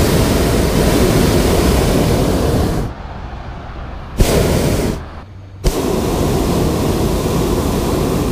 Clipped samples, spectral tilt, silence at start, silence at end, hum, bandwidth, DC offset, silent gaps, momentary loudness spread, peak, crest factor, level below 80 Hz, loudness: under 0.1%; -5.5 dB/octave; 0 s; 0 s; none; 15.5 kHz; under 0.1%; none; 16 LU; 0 dBFS; 14 dB; -22 dBFS; -15 LUFS